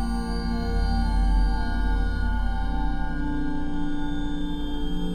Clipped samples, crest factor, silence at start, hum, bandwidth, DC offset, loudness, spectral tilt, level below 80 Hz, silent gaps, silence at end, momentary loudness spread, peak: under 0.1%; 12 dB; 0 s; none; 9.6 kHz; under 0.1%; -28 LUFS; -7 dB/octave; -26 dBFS; none; 0 s; 6 LU; -12 dBFS